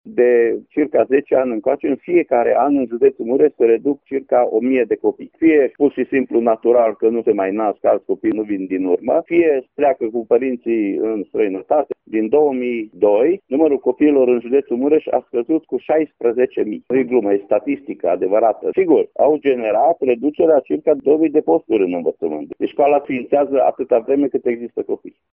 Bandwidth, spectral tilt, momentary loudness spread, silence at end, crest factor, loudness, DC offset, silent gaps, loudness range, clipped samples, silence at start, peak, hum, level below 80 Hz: 3.4 kHz; -6 dB/octave; 7 LU; 0.25 s; 14 dB; -17 LUFS; under 0.1%; none; 2 LU; under 0.1%; 0.05 s; -2 dBFS; none; -60 dBFS